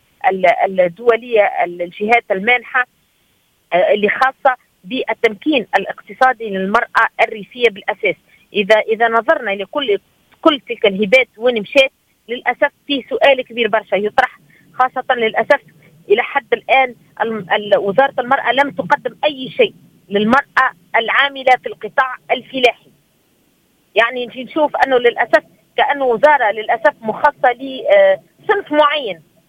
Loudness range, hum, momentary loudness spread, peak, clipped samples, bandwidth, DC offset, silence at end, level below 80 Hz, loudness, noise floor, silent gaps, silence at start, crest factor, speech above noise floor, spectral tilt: 2 LU; none; 8 LU; 0 dBFS; under 0.1%; 15.5 kHz; under 0.1%; 0.3 s; -60 dBFS; -15 LUFS; -59 dBFS; none; 0.25 s; 16 dB; 44 dB; -5 dB/octave